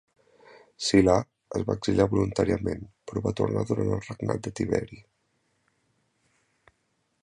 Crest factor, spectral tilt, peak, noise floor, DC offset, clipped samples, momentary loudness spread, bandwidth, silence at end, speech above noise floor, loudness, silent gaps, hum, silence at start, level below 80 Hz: 22 dB; -6 dB/octave; -6 dBFS; -74 dBFS; under 0.1%; under 0.1%; 11 LU; 11 kHz; 2.2 s; 48 dB; -27 LUFS; none; none; 0.8 s; -48 dBFS